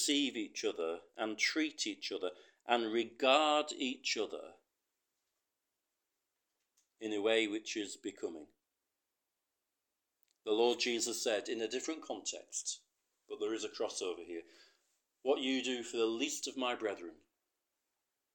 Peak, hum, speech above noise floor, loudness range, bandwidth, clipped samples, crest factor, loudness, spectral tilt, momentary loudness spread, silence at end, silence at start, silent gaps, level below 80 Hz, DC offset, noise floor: -14 dBFS; none; 52 dB; 8 LU; 18 kHz; under 0.1%; 26 dB; -36 LUFS; -1 dB/octave; 13 LU; 1.2 s; 0 s; none; under -90 dBFS; under 0.1%; -89 dBFS